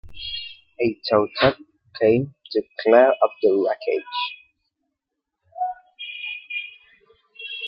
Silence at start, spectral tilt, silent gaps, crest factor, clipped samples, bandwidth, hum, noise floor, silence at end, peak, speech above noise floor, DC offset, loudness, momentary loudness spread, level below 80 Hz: 0.05 s; -9 dB/octave; none; 20 dB; under 0.1%; 5.8 kHz; none; -82 dBFS; 0 s; -2 dBFS; 62 dB; under 0.1%; -22 LUFS; 18 LU; -56 dBFS